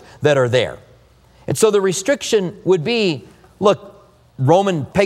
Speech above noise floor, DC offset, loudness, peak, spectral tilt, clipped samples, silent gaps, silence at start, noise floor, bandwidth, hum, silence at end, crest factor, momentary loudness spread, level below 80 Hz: 33 dB; under 0.1%; -17 LUFS; 0 dBFS; -5 dB/octave; under 0.1%; none; 0.2 s; -49 dBFS; 16 kHz; none; 0 s; 18 dB; 9 LU; -52 dBFS